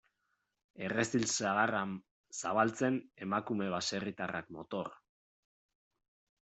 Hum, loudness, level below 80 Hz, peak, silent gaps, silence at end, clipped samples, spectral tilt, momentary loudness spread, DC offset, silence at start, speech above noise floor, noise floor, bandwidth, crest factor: none; -35 LUFS; -74 dBFS; -16 dBFS; 2.11-2.24 s; 1.55 s; under 0.1%; -4 dB/octave; 11 LU; under 0.1%; 0.75 s; 47 dB; -82 dBFS; 8.2 kHz; 22 dB